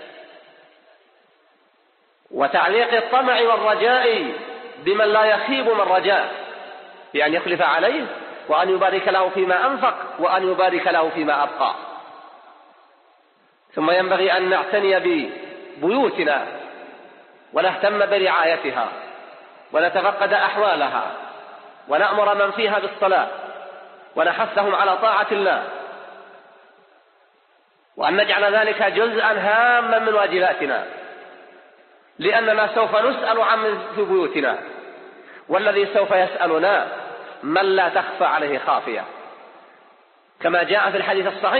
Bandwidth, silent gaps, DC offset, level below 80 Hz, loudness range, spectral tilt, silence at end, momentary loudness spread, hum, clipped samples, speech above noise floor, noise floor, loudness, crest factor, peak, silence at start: 4.6 kHz; none; under 0.1%; -74 dBFS; 4 LU; -0.5 dB/octave; 0 s; 17 LU; none; under 0.1%; 42 dB; -61 dBFS; -19 LUFS; 16 dB; -4 dBFS; 0 s